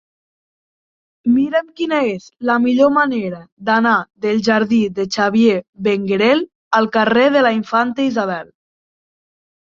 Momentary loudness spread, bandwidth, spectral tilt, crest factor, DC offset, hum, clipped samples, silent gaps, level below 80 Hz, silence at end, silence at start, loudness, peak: 8 LU; 7.4 kHz; -5.5 dB/octave; 16 dB; under 0.1%; none; under 0.1%; 3.52-3.57 s, 5.69-5.73 s, 6.55-6.71 s; -60 dBFS; 1.3 s; 1.25 s; -16 LUFS; -2 dBFS